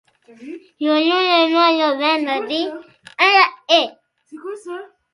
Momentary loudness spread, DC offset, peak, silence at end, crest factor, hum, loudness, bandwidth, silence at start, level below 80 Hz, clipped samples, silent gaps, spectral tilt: 22 LU; under 0.1%; 0 dBFS; 0.3 s; 18 dB; none; -16 LUFS; 11.5 kHz; 0.4 s; -72 dBFS; under 0.1%; none; -2 dB/octave